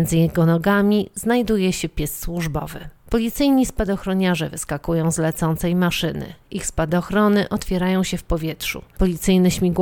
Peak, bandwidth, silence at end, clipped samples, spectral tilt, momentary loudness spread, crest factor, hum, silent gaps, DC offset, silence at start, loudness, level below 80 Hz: -6 dBFS; 19.5 kHz; 0 s; under 0.1%; -5.5 dB/octave; 9 LU; 14 dB; none; none; under 0.1%; 0 s; -20 LUFS; -34 dBFS